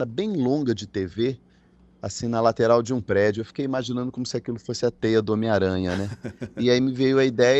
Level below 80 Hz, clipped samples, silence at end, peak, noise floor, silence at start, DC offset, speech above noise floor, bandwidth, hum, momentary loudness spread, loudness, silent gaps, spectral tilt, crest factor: -56 dBFS; under 0.1%; 0 s; -4 dBFS; -56 dBFS; 0 s; under 0.1%; 33 dB; 8.4 kHz; none; 10 LU; -24 LUFS; none; -6 dB/octave; 18 dB